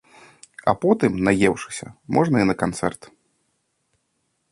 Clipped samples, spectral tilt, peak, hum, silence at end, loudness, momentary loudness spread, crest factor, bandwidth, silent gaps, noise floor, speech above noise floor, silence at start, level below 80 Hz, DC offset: under 0.1%; -6 dB/octave; -2 dBFS; none; 1.6 s; -21 LUFS; 12 LU; 20 dB; 11.5 kHz; none; -72 dBFS; 52 dB; 0.65 s; -52 dBFS; under 0.1%